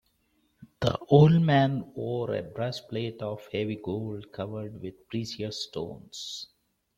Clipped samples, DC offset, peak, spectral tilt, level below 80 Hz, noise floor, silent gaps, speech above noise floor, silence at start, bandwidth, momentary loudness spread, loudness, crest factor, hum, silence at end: under 0.1%; under 0.1%; -6 dBFS; -7 dB/octave; -60 dBFS; -71 dBFS; none; 44 dB; 0.6 s; 8.2 kHz; 18 LU; -28 LUFS; 22 dB; none; 0.55 s